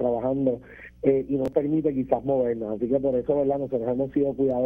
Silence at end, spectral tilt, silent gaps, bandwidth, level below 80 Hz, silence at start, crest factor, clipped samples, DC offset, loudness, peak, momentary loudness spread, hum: 0 s; -10.5 dB/octave; none; 3.7 kHz; -52 dBFS; 0 s; 18 dB; under 0.1%; under 0.1%; -25 LUFS; -8 dBFS; 3 LU; none